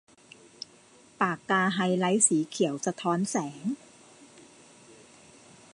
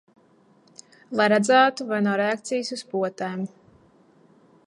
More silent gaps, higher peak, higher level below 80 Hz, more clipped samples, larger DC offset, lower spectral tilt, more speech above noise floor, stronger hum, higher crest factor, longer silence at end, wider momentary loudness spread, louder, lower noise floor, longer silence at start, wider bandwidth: neither; second, -8 dBFS vs -4 dBFS; about the same, -78 dBFS vs -74 dBFS; neither; neither; about the same, -4 dB/octave vs -4.5 dB/octave; second, 30 dB vs 36 dB; neither; about the same, 24 dB vs 20 dB; first, 1.35 s vs 1.2 s; first, 21 LU vs 13 LU; second, -27 LUFS vs -23 LUFS; about the same, -57 dBFS vs -58 dBFS; about the same, 1.2 s vs 1.1 s; about the same, 11.5 kHz vs 11 kHz